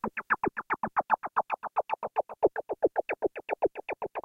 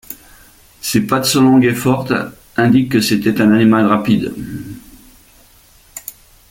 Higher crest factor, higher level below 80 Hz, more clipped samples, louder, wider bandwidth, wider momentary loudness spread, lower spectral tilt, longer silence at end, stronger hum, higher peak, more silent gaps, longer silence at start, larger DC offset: first, 20 dB vs 14 dB; second, -64 dBFS vs -46 dBFS; neither; second, -31 LUFS vs -14 LUFS; second, 6.4 kHz vs 17 kHz; second, 4 LU vs 22 LU; first, -7.5 dB/octave vs -5 dB/octave; second, 0.05 s vs 0.4 s; neither; second, -12 dBFS vs -2 dBFS; neither; about the same, 0.05 s vs 0.1 s; neither